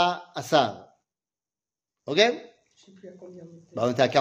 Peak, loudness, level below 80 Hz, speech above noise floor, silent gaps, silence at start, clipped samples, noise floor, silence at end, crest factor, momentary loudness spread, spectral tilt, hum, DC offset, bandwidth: -4 dBFS; -24 LUFS; -72 dBFS; over 65 dB; none; 0 s; under 0.1%; under -90 dBFS; 0 s; 22 dB; 24 LU; -4 dB/octave; none; under 0.1%; 15.5 kHz